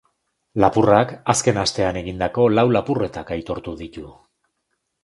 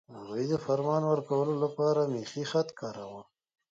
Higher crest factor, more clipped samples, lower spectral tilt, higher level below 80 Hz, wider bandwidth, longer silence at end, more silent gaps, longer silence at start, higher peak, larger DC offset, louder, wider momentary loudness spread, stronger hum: about the same, 20 dB vs 16 dB; neither; second, -5 dB/octave vs -6.5 dB/octave; first, -46 dBFS vs -72 dBFS; first, 11.5 kHz vs 7.8 kHz; first, 0.95 s vs 0.55 s; neither; first, 0.55 s vs 0.1 s; first, 0 dBFS vs -16 dBFS; neither; first, -19 LUFS vs -30 LUFS; first, 15 LU vs 12 LU; neither